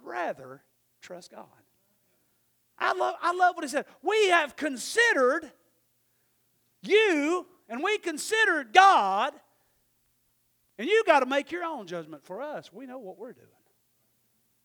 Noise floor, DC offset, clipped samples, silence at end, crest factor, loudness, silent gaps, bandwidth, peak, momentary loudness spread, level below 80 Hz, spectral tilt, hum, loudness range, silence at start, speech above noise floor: -71 dBFS; under 0.1%; under 0.1%; 1.3 s; 26 dB; -25 LUFS; none; over 20 kHz; -2 dBFS; 21 LU; -80 dBFS; -2 dB/octave; none; 7 LU; 0.05 s; 45 dB